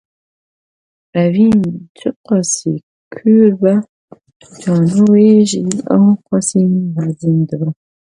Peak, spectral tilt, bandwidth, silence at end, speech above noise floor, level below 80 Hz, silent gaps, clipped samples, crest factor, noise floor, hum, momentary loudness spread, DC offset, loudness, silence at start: 0 dBFS; -6.5 dB/octave; 11 kHz; 0.4 s; over 78 dB; -54 dBFS; 1.89-1.95 s, 2.16-2.24 s, 2.83-3.11 s, 3.89-4.08 s, 4.36-4.40 s; under 0.1%; 14 dB; under -90 dBFS; none; 13 LU; under 0.1%; -13 LUFS; 1.15 s